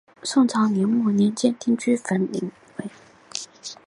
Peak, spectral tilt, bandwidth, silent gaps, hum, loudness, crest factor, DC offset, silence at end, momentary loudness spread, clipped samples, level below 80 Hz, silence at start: -6 dBFS; -5.5 dB/octave; 11.5 kHz; none; none; -22 LUFS; 18 dB; under 0.1%; 0.15 s; 16 LU; under 0.1%; -70 dBFS; 0.25 s